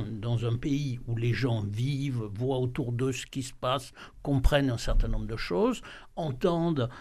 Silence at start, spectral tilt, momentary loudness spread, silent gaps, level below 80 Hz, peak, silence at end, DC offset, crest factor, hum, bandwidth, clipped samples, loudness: 0 s; -6.5 dB/octave; 8 LU; none; -36 dBFS; -8 dBFS; 0 s; under 0.1%; 20 dB; none; 13.5 kHz; under 0.1%; -30 LUFS